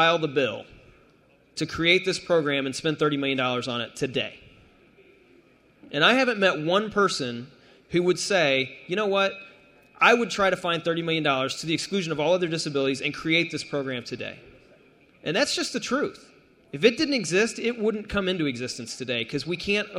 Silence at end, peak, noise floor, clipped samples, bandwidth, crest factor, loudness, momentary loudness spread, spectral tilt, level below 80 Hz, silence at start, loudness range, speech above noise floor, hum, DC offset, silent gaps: 0 s; -4 dBFS; -59 dBFS; under 0.1%; 15.5 kHz; 22 dB; -24 LUFS; 11 LU; -4 dB/octave; -58 dBFS; 0 s; 4 LU; 34 dB; none; under 0.1%; none